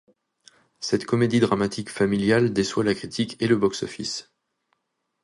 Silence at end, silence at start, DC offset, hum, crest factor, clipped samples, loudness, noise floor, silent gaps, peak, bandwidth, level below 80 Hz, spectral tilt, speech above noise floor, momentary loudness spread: 1 s; 0.8 s; under 0.1%; none; 20 dB; under 0.1%; -23 LUFS; -77 dBFS; none; -6 dBFS; 11.5 kHz; -56 dBFS; -5.5 dB/octave; 54 dB; 10 LU